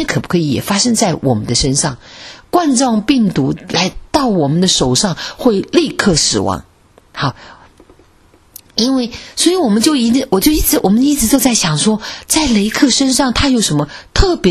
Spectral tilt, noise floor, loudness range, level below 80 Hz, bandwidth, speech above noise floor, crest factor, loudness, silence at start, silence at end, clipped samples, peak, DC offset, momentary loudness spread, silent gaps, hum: -4 dB/octave; -48 dBFS; 5 LU; -30 dBFS; 14 kHz; 35 dB; 14 dB; -13 LUFS; 0 s; 0 s; under 0.1%; 0 dBFS; under 0.1%; 8 LU; none; none